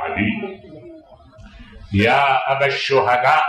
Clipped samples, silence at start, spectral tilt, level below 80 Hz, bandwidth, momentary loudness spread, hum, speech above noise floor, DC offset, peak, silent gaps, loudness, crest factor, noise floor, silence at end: under 0.1%; 0 s; -5.5 dB/octave; -48 dBFS; 13 kHz; 13 LU; none; 28 dB; under 0.1%; -4 dBFS; none; -17 LUFS; 16 dB; -44 dBFS; 0 s